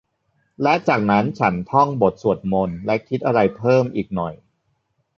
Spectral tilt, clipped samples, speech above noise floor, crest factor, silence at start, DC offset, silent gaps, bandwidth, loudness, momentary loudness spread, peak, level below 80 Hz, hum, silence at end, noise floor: -8 dB/octave; under 0.1%; 50 dB; 18 dB; 0.6 s; under 0.1%; none; 7.2 kHz; -19 LUFS; 7 LU; -2 dBFS; -50 dBFS; none; 0.8 s; -69 dBFS